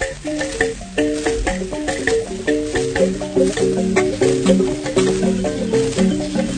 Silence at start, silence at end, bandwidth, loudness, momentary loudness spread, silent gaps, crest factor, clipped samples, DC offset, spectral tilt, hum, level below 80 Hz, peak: 0 s; 0 s; 9.6 kHz; -19 LUFS; 5 LU; none; 16 dB; under 0.1%; under 0.1%; -5 dB/octave; none; -36 dBFS; -2 dBFS